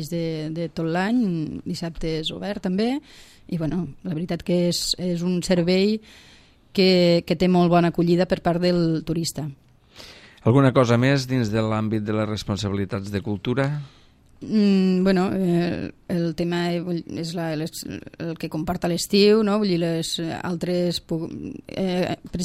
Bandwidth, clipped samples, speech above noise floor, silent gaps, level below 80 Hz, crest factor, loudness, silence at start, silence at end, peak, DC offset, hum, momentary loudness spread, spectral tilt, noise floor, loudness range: 15.5 kHz; under 0.1%; 24 dB; none; -48 dBFS; 20 dB; -23 LUFS; 0 s; 0 s; -2 dBFS; under 0.1%; none; 12 LU; -6 dB/octave; -46 dBFS; 6 LU